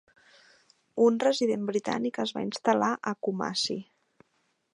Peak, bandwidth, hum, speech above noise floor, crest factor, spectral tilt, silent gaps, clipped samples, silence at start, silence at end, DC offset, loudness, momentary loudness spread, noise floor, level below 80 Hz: -8 dBFS; 11.5 kHz; none; 46 dB; 20 dB; -4.5 dB/octave; none; under 0.1%; 0.95 s; 0.9 s; under 0.1%; -28 LUFS; 8 LU; -74 dBFS; -74 dBFS